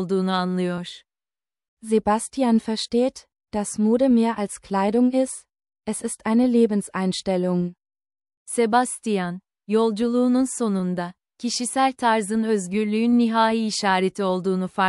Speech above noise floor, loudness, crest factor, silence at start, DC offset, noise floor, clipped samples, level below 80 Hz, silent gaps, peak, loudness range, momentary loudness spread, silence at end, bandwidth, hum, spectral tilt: over 69 dB; -22 LUFS; 16 dB; 0 s; under 0.1%; under -90 dBFS; under 0.1%; -60 dBFS; 1.68-1.77 s, 8.37-8.46 s; -6 dBFS; 3 LU; 10 LU; 0 s; 12 kHz; none; -5 dB/octave